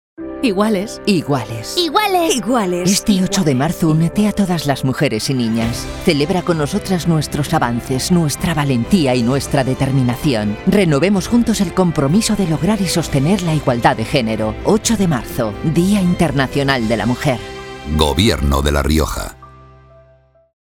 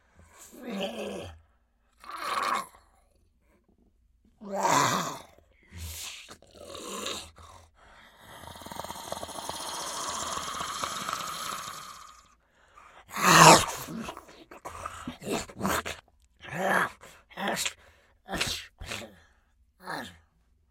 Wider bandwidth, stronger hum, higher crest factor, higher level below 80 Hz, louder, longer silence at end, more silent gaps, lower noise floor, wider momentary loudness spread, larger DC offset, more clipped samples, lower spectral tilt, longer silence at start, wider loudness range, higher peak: about the same, 18 kHz vs 16.5 kHz; neither; second, 16 dB vs 30 dB; first, -32 dBFS vs -58 dBFS; first, -16 LUFS vs -28 LUFS; first, 1.2 s vs 0.55 s; neither; second, -51 dBFS vs -68 dBFS; second, 5 LU vs 22 LU; neither; neither; first, -5.5 dB/octave vs -2.5 dB/octave; second, 0.2 s vs 0.4 s; second, 2 LU vs 16 LU; about the same, 0 dBFS vs -2 dBFS